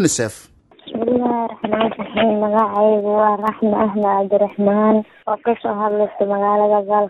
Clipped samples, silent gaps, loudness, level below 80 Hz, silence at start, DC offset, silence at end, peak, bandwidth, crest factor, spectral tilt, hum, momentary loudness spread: under 0.1%; none; -17 LUFS; -56 dBFS; 0 s; under 0.1%; 0 s; -2 dBFS; 12.5 kHz; 14 dB; -5.5 dB/octave; none; 6 LU